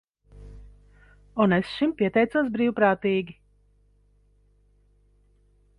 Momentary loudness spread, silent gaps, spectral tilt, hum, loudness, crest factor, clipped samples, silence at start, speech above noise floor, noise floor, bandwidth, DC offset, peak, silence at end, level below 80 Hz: 7 LU; none; -8 dB/octave; 50 Hz at -50 dBFS; -24 LUFS; 20 dB; under 0.1%; 0.35 s; 39 dB; -62 dBFS; 10.5 kHz; under 0.1%; -8 dBFS; 2.45 s; -54 dBFS